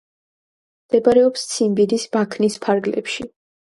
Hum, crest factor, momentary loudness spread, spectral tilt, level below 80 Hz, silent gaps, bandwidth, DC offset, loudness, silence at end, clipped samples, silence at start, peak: none; 18 dB; 11 LU; -4.5 dB/octave; -58 dBFS; none; 11.5 kHz; under 0.1%; -19 LUFS; 0.35 s; under 0.1%; 0.9 s; -2 dBFS